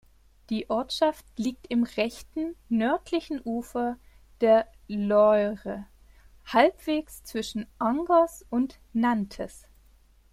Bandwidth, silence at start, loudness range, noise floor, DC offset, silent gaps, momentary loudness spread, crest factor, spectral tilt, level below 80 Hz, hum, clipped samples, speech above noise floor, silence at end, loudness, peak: 15.5 kHz; 0.5 s; 4 LU; -58 dBFS; under 0.1%; none; 13 LU; 22 dB; -5.5 dB/octave; -56 dBFS; none; under 0.1%; 32 dB; 0.75 s; -27 LUFS; -4 dBFS